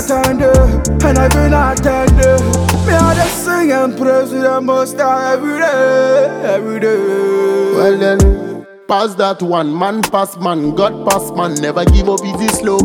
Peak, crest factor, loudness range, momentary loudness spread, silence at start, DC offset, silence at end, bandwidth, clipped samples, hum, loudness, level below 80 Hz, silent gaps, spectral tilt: 0 dBFS; 12 dB; 3 LU; 5 LU; 0 s; under 0.1%; 0 s; 18.5 kHz; under 0.1%; none; -13 LUFS; -20 dBFS; none; -5.5 dB/octave